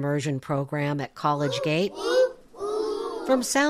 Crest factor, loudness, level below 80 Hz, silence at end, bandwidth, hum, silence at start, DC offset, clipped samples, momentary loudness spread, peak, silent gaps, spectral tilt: 16 dB; -26 LUFS; -60 dBFS; 0 s; 15 kHz; none; 0 s; under 0.1%; under 0.1%; 6 LU; -10 dBFS; none; -5 dB/octave